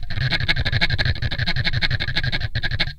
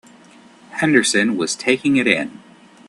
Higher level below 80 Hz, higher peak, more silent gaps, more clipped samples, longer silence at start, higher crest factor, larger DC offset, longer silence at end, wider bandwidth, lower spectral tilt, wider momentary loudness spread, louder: first, -26 dBFS vs -60 dBFS; about the same, 0 dBFS vs 0 dBFS; neither; neither; second, 0 s vs 0.7 s; about the same, 20 dB vs 20 dB; neither; second, 0 s vs 0.5 s; second, 9 kHz vs 12.5 kHz; first, -5 dB/octave vs -3.5 dB/octave; second, 4 LU vs 9 LU; second, -22 LUFS vs -17 LUFS